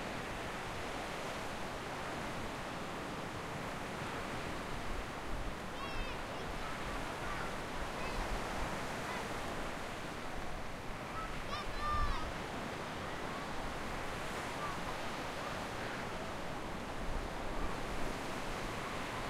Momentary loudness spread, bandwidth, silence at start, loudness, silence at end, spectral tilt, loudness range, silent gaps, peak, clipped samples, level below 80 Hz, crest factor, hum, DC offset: 3 LU; 16 kHz; 0 s; -41 LUFS; 0 s; -4.5 dB/octave; 1 LU; none; -22 dBFS; under 0.1%; -48 dBFS; 18 dB; none; under 0.1%